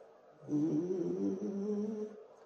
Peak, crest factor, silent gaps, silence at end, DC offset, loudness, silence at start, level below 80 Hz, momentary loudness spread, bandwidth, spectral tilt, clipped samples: -26 dBFS; 12 dB; none; 0 s; under 0.1%; -37 LUFS; 0 s; -84 dBFS; 10 LU; 6.8 kHz; -9 dB/octave; under 0.1%